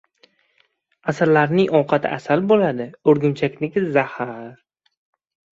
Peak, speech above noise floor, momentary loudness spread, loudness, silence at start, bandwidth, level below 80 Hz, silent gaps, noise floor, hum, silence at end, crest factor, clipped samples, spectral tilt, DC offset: -2 dBFS; 45 dB; 13 LU; -19 LUFS; 1.05 s; 7.8 kHz; -62 dBFS; none; -64 dBFS; none; 1.05 s; 18 dB; under 0.1%; -7.5 dB/octave; under 0.1%